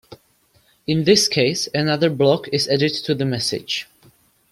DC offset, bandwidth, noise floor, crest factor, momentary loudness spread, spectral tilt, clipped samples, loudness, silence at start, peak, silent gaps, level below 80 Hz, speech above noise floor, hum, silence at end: under 0.1%; 16 kHz; -59 dBFS; 18 dB; 10 LU; -4 dB/octave; under 0.1%; -19 LUFS; 0.1 s; -2 dBFS; none; -58 dBFS; 40 dB; none; 0.7 s